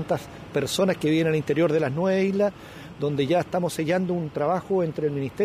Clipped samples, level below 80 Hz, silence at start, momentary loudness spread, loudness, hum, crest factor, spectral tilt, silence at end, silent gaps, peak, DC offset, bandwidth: under 0.1%; -56 dBFS; 0 s; 7 LU; -24 LUFS; none; 12 dB; -6 dB/octave; 0 s; none; -12 dBFS; under 0.1%; 15.5 kHz